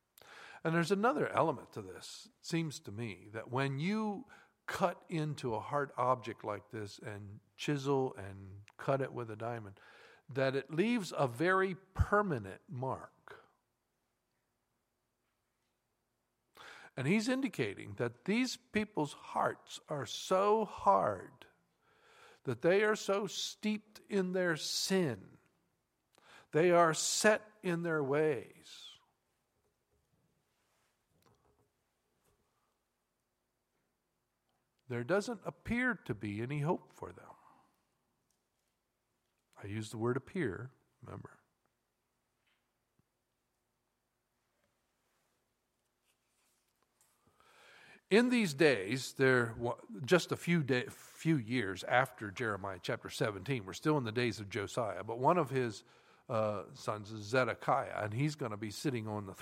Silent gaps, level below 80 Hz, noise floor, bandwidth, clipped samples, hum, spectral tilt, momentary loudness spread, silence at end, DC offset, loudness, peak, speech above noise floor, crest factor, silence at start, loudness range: none; -62 dBFS; -84 dBFS; 16 kHz; under 0.1%; none; -5 dB/octave; 17 LU; 0 s; under 0.1%; -35 LUFS; -12 dBFS; 49 dB; 24 dB; 0.25 s; 10 LU